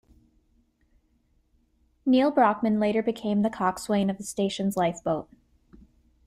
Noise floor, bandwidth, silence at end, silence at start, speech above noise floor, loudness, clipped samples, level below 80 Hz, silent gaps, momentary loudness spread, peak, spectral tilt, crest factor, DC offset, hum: -67 dBFS; 14.5 kHz; 1.05 s; 2.05 s; 43 dB; -25 LUFS; under 0.1%; -60 dBFS; none; 8 LU; -10 dBFS; -6 dB/octave; 18 dB; under 0.1%; none